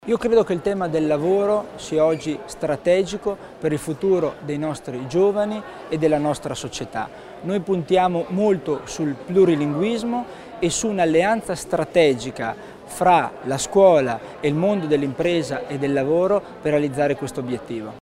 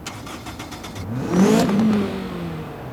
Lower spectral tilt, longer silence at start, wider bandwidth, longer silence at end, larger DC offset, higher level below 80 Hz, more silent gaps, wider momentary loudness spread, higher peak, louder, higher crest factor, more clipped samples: about the same, -5.5 dB/octave vs -6 dB/octave; about the same, 0.05 s vs 0 s; about the same, 15.5 kHz vs 16.5 kHz; about the same, 0.1 s vs 0 s; neither; second, -52 dBFS vs -46 dBFS; neither; second, 11 LU vs 17 LU; about the same, -4 dBFS vs -4 dBFS; about the same, -21 LUFS vs -20 LUFS; about the same, 18 dB vs 16 dB; neither